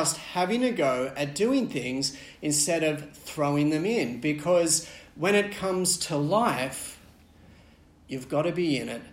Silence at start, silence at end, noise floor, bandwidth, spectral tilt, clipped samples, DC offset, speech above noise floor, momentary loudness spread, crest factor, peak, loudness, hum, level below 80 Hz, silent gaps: 0 s; 0 s; -55 dBFS; 16.5 kHz; -4 dB/octave; under 0.1%; under 0.1%; 29 dB; 9 LU; 18 dB; -10 dBFS; -26 LUFS; none; -60 dBFS; none